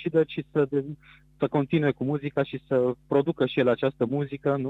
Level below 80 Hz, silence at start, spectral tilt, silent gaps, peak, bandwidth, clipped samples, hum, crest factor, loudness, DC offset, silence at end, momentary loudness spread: -62 dBFS; 0 s; -9.5 dB/octave; none; -10 dBFS; 4.5 kHz; under 0.1%; none; 16 dB; -26 LUFS; under 0.1%; 0 s; 5 LU